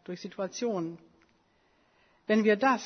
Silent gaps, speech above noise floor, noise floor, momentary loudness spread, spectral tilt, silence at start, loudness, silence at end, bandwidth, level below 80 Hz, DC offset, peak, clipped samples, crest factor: none; 40 dB; -68 dBFS; 19 LU; -5 dB/octave; 0.1 s; -29 LUFS; 0 s; 6.6 kHz; -78 dBFS; under 0.1%; -12 dBFS; under 0.1%; 18 dB